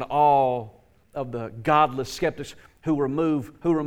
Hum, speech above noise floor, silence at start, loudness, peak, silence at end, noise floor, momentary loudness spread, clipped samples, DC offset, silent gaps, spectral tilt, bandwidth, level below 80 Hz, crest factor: none; 27 dB; 0 s; -24 LUFS; -6 dBFS; 0 s; -51 dBFS; 18 LU; under 0.1%; under 0.1%; none; -6.5 dB/octave; 16.5 kHz; -54 dBFS; 18 dB